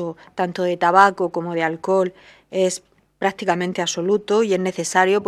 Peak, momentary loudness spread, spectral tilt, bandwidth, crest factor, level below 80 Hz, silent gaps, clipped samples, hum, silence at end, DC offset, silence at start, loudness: 0 dBFS; 10 LU; -4.5 dB/octave; 13.5 kHz; 20 dB; -66 dBFS; none; under 0.1%; none; 0 s; under 0.1%; 0 s; -20 LUFS